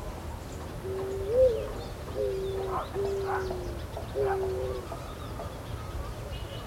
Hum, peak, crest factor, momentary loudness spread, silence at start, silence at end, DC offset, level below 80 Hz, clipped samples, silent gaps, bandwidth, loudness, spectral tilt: none; -12 dBFS; 20 dB; 13 LU; 0 s; 0 s; under 0.1%; -42 dBFS; under 0.1%; none; 16 kHz; -33 LUFS; -6 dB/octave